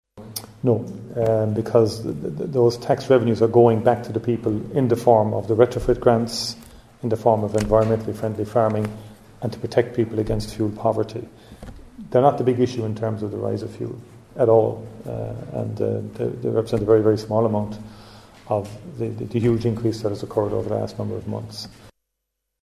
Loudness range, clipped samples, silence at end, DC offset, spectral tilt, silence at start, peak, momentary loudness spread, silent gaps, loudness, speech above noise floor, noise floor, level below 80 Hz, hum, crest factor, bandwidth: 6 LU; under 0.1%; 0.8 s; under 0.1%; -7.5 dB/octave; 0.15 s; -2 dBFS; 15 LU; none; -22 LUFS; 58 dB; -79 dBFS; -46 dBFS; none; 20 dB; 15 kHz